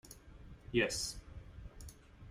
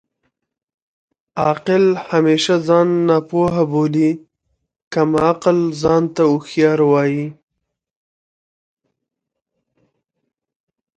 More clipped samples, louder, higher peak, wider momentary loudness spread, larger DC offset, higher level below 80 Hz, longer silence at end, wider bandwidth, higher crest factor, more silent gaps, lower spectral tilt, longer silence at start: neither; second, -36 LUFS vs -16 LUFS; second, -18 dBFS vs 0 dBFS; first, 22 LU vs 6 LU; neither; about the same, -54 dBFS vs -54 dBFS; second, 0 s vs 3.65 s; first, 16 kHz vs 9.2 kHz; first, 24 dB vs 18 dB; second, none vs 4.82-4.91 s; second, -3.5 dB/octave vs -6.5 dB/octave; second, 0.05 s vs 1.35 s